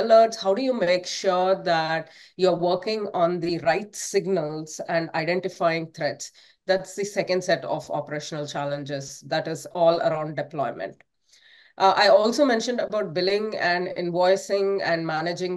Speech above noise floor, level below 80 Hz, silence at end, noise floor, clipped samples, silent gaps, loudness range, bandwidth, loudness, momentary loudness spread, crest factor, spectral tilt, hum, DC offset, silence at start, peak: 33 dB; -70 dBFS; 0 s; -57 dBFS; under 0.1%; none; 5 LU; 12.5 kHz; -24 LUFS; 10 LU; 18 dB; -4.5 dB/octave; none; under 0.1%; 0 s; -6 dBFS